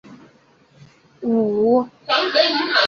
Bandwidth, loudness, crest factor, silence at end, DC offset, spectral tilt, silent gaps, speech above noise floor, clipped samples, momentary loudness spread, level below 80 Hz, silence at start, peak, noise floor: 7 kHz; -18 LUFS; 16 dB; 0 s; under 0.1%; -4.5 dB/octave; none; 36 dB; under 0.1%; 5 LU; -64 dBFS; 0.1 s; -4 dBFS; -54 dBFS